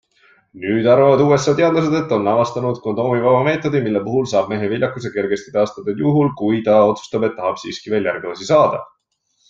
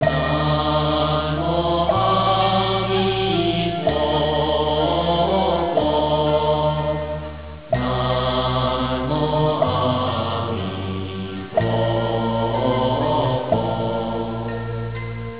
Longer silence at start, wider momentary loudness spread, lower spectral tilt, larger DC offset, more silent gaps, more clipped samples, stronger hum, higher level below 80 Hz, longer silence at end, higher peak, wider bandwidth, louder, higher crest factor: first, 0.55 s vs 0 s; about the same, 9 LU vs 8 LU; second, -6.5 dB/octave vs -10.5 dB/octave; second, under 0.1% vs 0.6%; neither; neither; neither; second, -56 dBFS vs -36 dBFS; first, 0.65 s vs 0 s; first, -2 dBFS vs -6 dBFS; first, 7.8 kHz vs 4 kHz; first, -17 LUFS vs -20 LUFS; about the same, 16 dB vs 14 dB